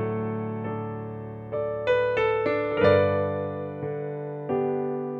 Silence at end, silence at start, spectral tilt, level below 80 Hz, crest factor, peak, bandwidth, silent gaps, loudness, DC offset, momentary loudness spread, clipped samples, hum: 0 s; 0 s; -8.5 dB/octave; -58 dBFS; 20 dB; -8 dBFS; 7 kHz; none; -26 LUFS; under 0.1%; 12 LU; under 0.1%; none